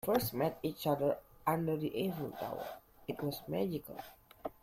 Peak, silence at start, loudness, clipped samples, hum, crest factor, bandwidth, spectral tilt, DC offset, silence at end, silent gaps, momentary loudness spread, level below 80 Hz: -18 dBFS; 0.05 s; -37 LUFS; under 0.1%; none; 18 dB; 16.5 kHz; -6 dB/octave; under 0.1%; 0.1 s; none; 14 LU; -66 dBFS